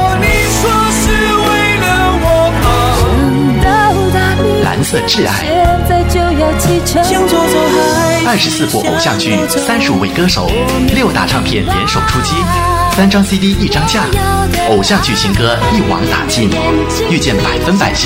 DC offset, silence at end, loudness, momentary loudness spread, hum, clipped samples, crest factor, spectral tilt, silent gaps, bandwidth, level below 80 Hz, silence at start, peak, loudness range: under 0.1%; 0 s; -11 LUFS; 2 LU; none; under 0.1%; 10 dB; -4.5 dB/octave; none; 16.5 kHz; -22 dBFS; 0 s; 0 dBFS; 1 LU